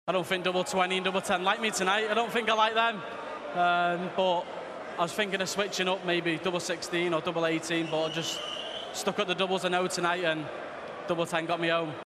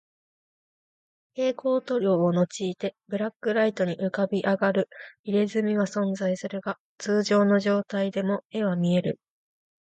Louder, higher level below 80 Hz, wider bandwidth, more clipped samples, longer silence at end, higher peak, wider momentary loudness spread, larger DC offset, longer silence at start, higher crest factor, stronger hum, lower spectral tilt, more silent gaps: second, -29 LUFS vs -26 LUFS; about the same, -70 dBFS vs -72 dBFS; first, 13.5 kHz vs 8.8 kHz; neither; second, 0.15 s vs 0.65 s; about the same, -10 dBFS vs -12 dBFS; about the same, 9 LU vs 10 LU; neither; second, 0.05 s vs 1.35 s; about the same, 18 dB vs 14 dB; neither; second, -3.5 dB/octave vs -6.5 dB/octave; second, none vs 3.36-3.40 s, 5.19-5.24 s, 6.80-6.96 s, 8.45-8.50 s